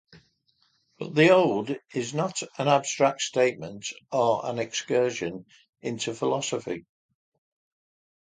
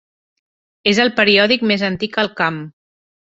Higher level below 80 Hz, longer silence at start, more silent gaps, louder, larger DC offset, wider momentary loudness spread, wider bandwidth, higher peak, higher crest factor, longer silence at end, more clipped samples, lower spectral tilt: second, -70 dBFS vs -56 dBFS; first, 1 s vs 0.85 s; first, 5.69-5.73 s vs none; second, -26 LUFS vs -15 LUFS; neither; first, 14 LU vs 8 LU; first, 9.6 kHz vs 8 kHz; second, -6 dBFS vs 0 dBFS; about the same, 22 dB vs 18 dB; first, 1.6 s vs 0.55 s; neither; about the same, -4.5 dB/octave vs -4.5 dB/octave